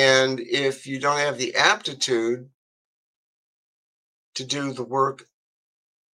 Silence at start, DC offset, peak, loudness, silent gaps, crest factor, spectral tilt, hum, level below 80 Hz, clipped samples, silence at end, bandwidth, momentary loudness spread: 0 s; under 0.1%; -2 dBFS; -23 LUFS; 2.54-4.33 s; 24 dB; -3 dB/octave; none; -76 dBFS; under 0.1%; 0.95 s; 12.5 kHz; 11 LU